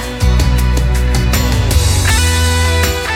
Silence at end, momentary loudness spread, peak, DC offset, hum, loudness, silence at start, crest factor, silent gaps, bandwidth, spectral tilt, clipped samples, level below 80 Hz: 0 s; 3 LU; 0 dBFS; under 0.1%; none; -13 LUFS; 0 s; 12 dB; none; 16.5 kHz; -4 dB/octave; under 0.1%; -14 dBFS